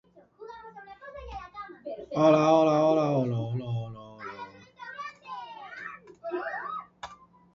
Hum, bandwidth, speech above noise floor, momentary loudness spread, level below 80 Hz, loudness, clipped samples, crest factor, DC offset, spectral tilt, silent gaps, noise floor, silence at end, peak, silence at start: none; 7.4 kHz; 25 dB; 24 LU; -60 dBFS; -26 LUFS; under 0.1%; 22 dB; under 0.1%; -7.5 dB/octave; none; -48 dBFS; 0.4 s; -8 dBFS; 0.4 s